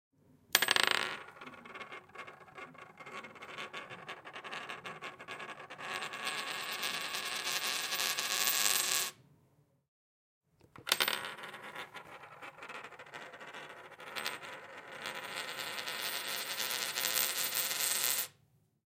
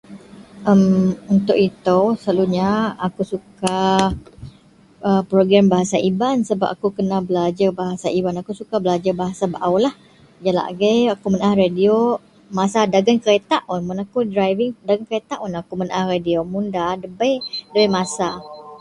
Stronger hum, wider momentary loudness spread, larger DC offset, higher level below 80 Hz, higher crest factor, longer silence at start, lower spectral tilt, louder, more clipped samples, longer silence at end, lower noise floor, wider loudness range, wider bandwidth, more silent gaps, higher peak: neither; first, 19 LU vs 9 LU; neither; second, -84 dBFS vs -50 dBFS; first, 34 dB vs 18 dB; first, 0.5 s vs 0.1 s; second, 1 dB/octave vs -6 dB/octave; second, -34 LUFS vs -19 LUFS; neither; first, 0.7 s vs 0.05 s; first, -71 dBFS vs -50 dBFS; first, 13 LU vs 4 LU; first, 17 kHz vs 11.5 kHz; first, 9.88-10.41 s vs none; second, -4 dBFS vs 0 dBFS